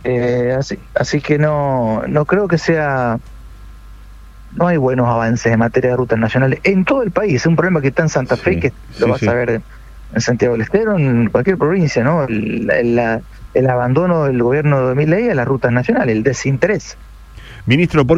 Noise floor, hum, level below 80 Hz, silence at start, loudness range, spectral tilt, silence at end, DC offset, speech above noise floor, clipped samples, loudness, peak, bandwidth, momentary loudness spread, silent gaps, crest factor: -37 dBFS; none; -38 dBFS; 0 s; 3 LU; -7 dB/octave; 0 s; under 0.1%; 22 dB; under 0.1%; -15 LUFS; 0 dBFS; 8 kHz; 5 LU; none; 14 dB